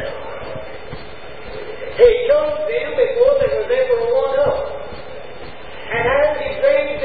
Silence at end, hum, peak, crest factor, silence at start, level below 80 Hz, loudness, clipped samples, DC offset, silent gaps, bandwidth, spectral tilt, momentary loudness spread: 0 s; none; 0 dBFS; 18 dB; 0 s; -42 dBFS; -17 LUFS; under 0.1%; 2%; none; 4.8 kHz; -9.5 dB/octave; 20 LU